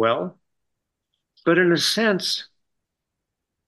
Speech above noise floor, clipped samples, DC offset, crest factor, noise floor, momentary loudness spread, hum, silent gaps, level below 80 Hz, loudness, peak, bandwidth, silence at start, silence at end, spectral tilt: 62 dB; under 0.1%; under 0.1%; 20 dB; -82 dBFS; 10 LU; none; none; -72 dBFS; -20 LUFS; -6 dBFS; 12.5 kHz; 0 s; 1.2 s; -4 dB/octave